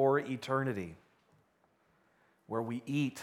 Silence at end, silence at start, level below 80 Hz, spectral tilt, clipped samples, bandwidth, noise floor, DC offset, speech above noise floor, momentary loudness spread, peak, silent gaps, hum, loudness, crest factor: 0 s; 0 s; -74 dBFS; -6.5 dB/octave; under 0.1%; 15 kHz; -72 dBFS; under 0.1%; 38 dB; 9 LU; -18 dBFS; none; none; -35 LUFS; 18 dB